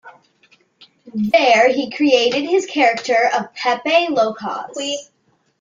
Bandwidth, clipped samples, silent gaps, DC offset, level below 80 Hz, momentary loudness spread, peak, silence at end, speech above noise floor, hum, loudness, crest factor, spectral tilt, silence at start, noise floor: 9.4 kHz; under 0.1%; none; under 0.1%; -66 dBFS; 12 LU; -2 dBFS; 0.55 s; 40 dB; none; -17 LUFS; 16 dB; -3.5 dB/octave; 0.05 s; -56 dBFS